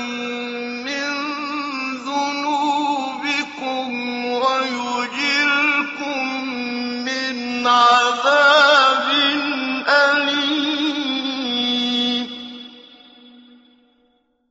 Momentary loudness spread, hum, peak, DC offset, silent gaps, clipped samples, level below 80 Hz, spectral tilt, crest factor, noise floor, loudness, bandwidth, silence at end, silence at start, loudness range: 12 LU; none; -2 dBFS; under 0.1%; none; under 0.1%; -68 dBFS; 1.5 dB/octave; 18 dB; -63 dBFS; -18 LUFS; 8 kHz; 1.25 s; 0 s; 8 LU